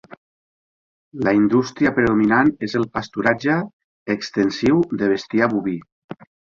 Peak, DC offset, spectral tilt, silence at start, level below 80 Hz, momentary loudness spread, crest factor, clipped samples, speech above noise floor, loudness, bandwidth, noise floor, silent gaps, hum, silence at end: -4 dBFS; under 0.1%; -6.5 dB/octave; 1.15 s; -52 dBFS; 20 LU; 18 dB; under 0.1%; over 71 dB; -19 LUFS; 7.4 kHz; under -90 dBFS; 3.73-4.06 s, 5.92-6.09 s; none; 0.45 s